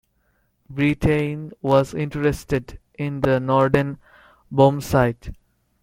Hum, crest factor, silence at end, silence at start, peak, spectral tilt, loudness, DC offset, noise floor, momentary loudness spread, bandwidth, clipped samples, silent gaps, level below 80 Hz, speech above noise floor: none; 20 dB; 0.5 s; 0.7 s; -2 dBFS; -7.5 dB/octave; -21 LUFS; under 0.1%; -66 dBFS; 14 LU; 16 kHz; under 0.1%; none; -42 dBFS; 46 dB